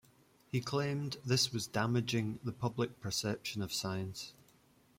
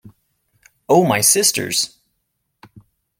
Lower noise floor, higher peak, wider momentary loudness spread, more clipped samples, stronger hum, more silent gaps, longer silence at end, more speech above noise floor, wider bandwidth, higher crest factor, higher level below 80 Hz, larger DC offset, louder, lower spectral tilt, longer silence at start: second, -67 dBFS vs -72 dBFS; second, -18 dBFS vs 0 dBFS; about the same, 8 LU vs 8 LU; neither; neither; neither; second, 0.65 s vs 1.35 s; second, 31 dB vs 57 dB; about the same, 16.5 kHz vs 16.5 kHz; about the same, 18 dB vs 20 dB; second, -68 dBFS vs -62 dBFS; neither; second, -36 LUFS vs -15 LUFS; first, -4.5 dB/octave vs -2.5 dB/octave; first, 0.55 s vs 0.05 s